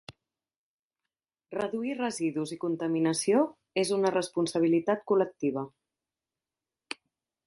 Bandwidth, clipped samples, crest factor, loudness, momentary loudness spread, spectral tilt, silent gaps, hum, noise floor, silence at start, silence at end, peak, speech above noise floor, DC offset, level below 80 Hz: 11.5 kHz; under 0.1%; 18 dB; -29 LUFS; 14 LU; -5 dB/octave; 0.56-0.90 s; none; under -90 dBFS; 0.1 s; 1.8 s; -12 dBFS; over 62 dB; under 0.1%; -74 dBFS